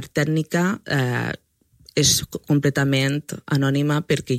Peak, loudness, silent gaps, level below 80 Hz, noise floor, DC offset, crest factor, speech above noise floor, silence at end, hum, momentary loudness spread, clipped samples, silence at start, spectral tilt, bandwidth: -4 dBFS; -21 LUFS; none; -52 dBFS; -53 dBFS; under 0.1%; 18 dB; 32 dB; 0 s; none; 9 LU; under 0.1%; 0 s; -4.5 dB/octave; 15.5 kHz